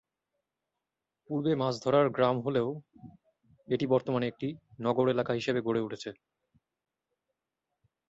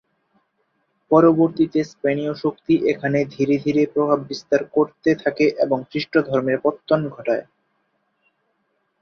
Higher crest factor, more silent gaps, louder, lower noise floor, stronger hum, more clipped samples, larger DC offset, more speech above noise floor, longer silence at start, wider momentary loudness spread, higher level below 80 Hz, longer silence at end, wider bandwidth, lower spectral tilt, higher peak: about the same, 20 dB vs 18 dB; neither; second, -30 LUFS vs -20 LUFS; first, -89 dBFS vs -70 dBFS; neither; neither; neither; first, 59 dB vs 51 dB; first, 1.3 s vs 1.1 s; first, 12 LU vs 7 LU; second, -70 dBFS vs -62 dBFS; first, 1.95 s vs 1.6 s; first, 8 kHz vs 6.6 kHz; about the same, -7 dB/octave vs -7.5 dB/octave; second, -12 dBFS vs -2 dBFS